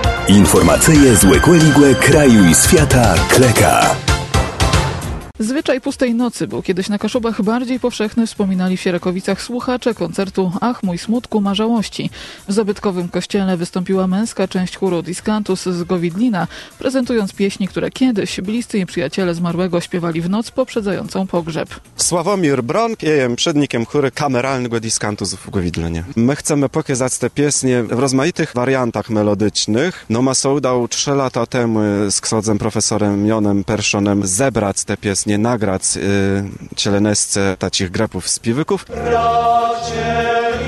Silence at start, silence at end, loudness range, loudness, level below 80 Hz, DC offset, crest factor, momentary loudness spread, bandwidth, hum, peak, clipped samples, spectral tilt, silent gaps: 0 s; 0 s; 8 LU; -16 LUFS; -32 dBFS; under 0.1%; 16 dB; 11 LU; 13 kHz; none; 0 dBFS; under 0.1%; -4.5 dB/octave; none